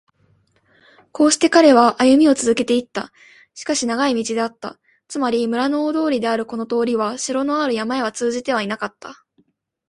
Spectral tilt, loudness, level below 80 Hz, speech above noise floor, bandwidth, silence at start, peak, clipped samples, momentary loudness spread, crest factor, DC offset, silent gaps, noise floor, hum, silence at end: -3 dB/octave; -18 LUFS; -60 dBFS; 44 dB; 11.5 kHz; 1.15 s; 0 dBFS; under 0.1%; 17 LU; 18 dB; under 0.1%; none; -62 dBFS; none; 0.75 s